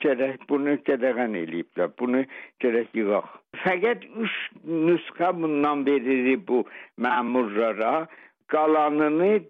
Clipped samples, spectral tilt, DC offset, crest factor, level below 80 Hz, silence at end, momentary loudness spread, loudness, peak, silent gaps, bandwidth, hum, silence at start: under 0.1%; -8.5 dB/octave; under 0.1%; 14 dB; -76 dBFS; 0.05 s; 7 LU; -25 LUFS; -12 dBFS; none; 4.9 kHz; none; 0 s